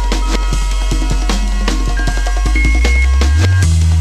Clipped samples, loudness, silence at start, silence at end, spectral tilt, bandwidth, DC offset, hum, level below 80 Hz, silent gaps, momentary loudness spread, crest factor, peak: under 0.1%; -15 LUFS; 0 s; 0 s; -5 dB/octave; 13 kHz; under 0.1%; none; -14 dBFS; none; 6 LU; 12 dB; 0 dBFS